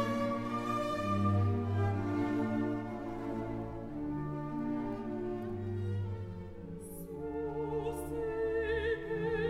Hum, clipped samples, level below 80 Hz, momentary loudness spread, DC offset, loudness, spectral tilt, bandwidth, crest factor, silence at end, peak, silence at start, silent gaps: none; under 0.1%; -52 dBFS; 9 LU; under 0.1%; -36 LUFS; -8 dB/octave; 14 kHz; 16 dB; 0 s; -20 dBFS; 0 s; none